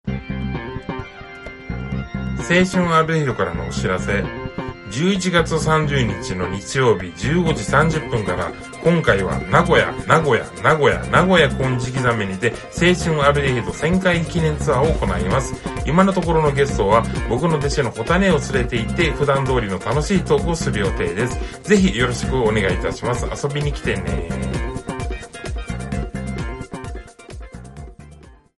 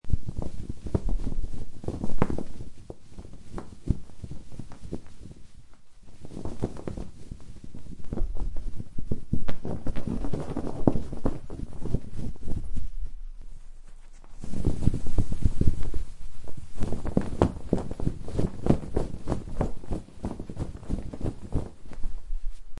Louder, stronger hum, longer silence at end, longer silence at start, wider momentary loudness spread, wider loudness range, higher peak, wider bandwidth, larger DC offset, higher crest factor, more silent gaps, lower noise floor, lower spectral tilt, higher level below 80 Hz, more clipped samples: first, -19 LUFS vs -33 LUFS; neither; first, 0.25 s vs 0 s; about the same, 0.05 s vs 0.05 s; second, 13 LU vs 19 LU; about the same, 8 LU vs 10 LU; about the same, 0 dBFS vs -2 dBFS; about the same, 11.5 kHz vs 10.5 kHz; neither; about the same, 20 dB vs 22 dB; neither; about the same, -44 dBFS vs -43 dBFS; second, -5.5 dB/octave vs -8 dB/octave; about the same, -32 dBFS vs -34 dBFS; neither